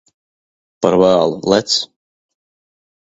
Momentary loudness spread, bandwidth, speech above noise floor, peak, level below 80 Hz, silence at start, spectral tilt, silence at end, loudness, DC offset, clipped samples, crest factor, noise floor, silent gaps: 7 LU; 8 kHz; over 77 dB; 0 dBFS; -52 dBFS; 0.8 s; -4.5 dB/octave; 1.2 s; -14 LUFS; under 0.1%; under 0.1%; 18 dB; under -90 dBFS; none